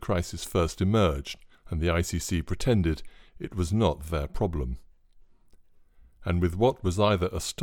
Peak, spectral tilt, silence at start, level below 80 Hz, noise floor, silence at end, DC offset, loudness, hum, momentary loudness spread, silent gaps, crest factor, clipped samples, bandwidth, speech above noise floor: -10 dBFS; -6 dB/octave; 0 s; -38 dBFS; -55 dBFS; 0 s; under 0.1%; -28 LUFS; none; 12 LU; none; 18 dB; under 0.1%; 18.5 kHz; 29 dB